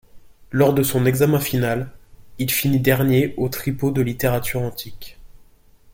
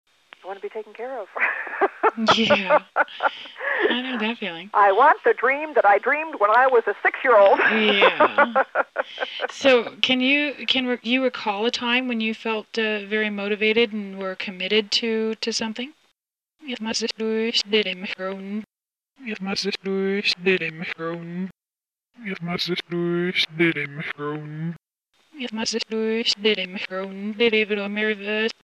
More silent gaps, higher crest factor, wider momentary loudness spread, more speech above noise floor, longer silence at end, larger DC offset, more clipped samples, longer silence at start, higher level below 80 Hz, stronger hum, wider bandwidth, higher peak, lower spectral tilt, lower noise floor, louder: neither; second, 16 dB vs 22 dB; second, 10 LU vs 15 LU; second, 31 dB vs over 68 dB; first, 0.65 s vs 0.1 s; neither; neither; second, 0.15 s vs 0.45 s; first, -44 dBFS vs -68 dBFS; neither; first, 17 kHz vs 11.5 kHz; second, -4 dBFS vs 0 dBFS; first, -6 dB/octave vs -4 dB/octave; second, -50 dBFS vs under -90 dBFS; about the same, -20 LUFS vs -21 LUFS